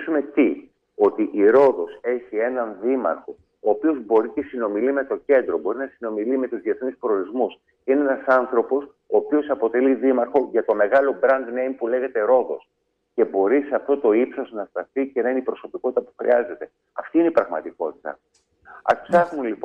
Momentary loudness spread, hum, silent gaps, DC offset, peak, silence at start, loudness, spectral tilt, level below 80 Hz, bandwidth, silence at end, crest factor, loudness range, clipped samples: 11 LU; none; none; under 0.1%; -6 dBFS; 0 s; -22 LUFS; -7.5 dB/octave; -66 dBFS; 5.8 kHz; 0 s; 16 dB; 3 LU; under 0.1%